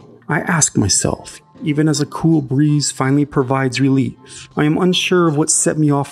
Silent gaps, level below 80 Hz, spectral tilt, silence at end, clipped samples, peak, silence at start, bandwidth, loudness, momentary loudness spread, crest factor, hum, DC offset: none; -48 dBFS; -4.5 dB/octave; 0 s; under 0.1%; 0 dBFS; 0.3 s; 15 kHz; -16 LUFS; 9 LU; 16 dB; none; under 0.1%